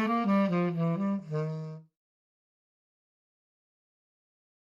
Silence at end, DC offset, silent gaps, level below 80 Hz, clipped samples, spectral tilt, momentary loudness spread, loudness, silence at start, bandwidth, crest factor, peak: 2.8 s; under 0.1%; none; -78 dBFS; under 0.1%; -9 dB/octave; 14 LU; -30 LUFS; 0 s; 7.2 kHz; 16 dB; -18 dBFS